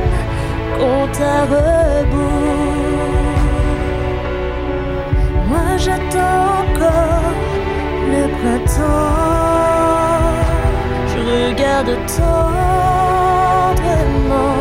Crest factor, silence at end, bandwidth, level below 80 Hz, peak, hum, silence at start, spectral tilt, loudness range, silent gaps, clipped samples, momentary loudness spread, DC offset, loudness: 10 dB; 0 s; 16 kHz; -20 dBFS; -4 dBFS; none; 0 s; -6.5 dB/octave; 3 LU; none; under 0.1%; 6 LU; under 0.1%; -15 LUFS